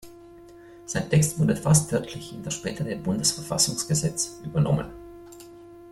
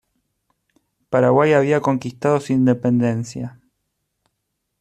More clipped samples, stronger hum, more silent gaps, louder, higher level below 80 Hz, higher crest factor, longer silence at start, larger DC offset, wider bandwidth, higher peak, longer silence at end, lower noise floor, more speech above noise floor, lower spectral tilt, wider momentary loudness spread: neither; neither; neither; second, -25 LUFS vs -18 LUFS; first, -50 dBFS vs -60 dBFS; about the same, 20 dB vs 18 dB; second, 0.05 s vs 1.1 s; neither; first, 14 kHz vs 10 kHz; second, -6 dBFS vs -2 dBFS; second, 0 s vs 1.3 s; second, -47 dBFS vs -76 dBFS; second, 22 dB vs 58 dB; second, -4.5 dB/octave vs -7.5 dB/octave; first, 23 LU vs 13 LU